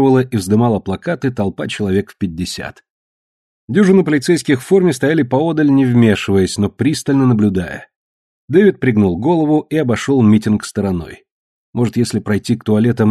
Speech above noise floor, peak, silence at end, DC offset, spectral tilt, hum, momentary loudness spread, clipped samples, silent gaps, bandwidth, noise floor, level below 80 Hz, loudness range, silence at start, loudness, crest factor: over 76 dB; 0 dBFS; 0 s; under 0.1%; -6.5 dB/octave; none; 10 LU; under 0.1%; 2.90-3.68 s, 7.96-8.48 s, 11.31-11.73 s; 13 kHz; under -90 dBFS; -46 dBFS; 4 LU; 0 s; -15 LUFS; 14 dB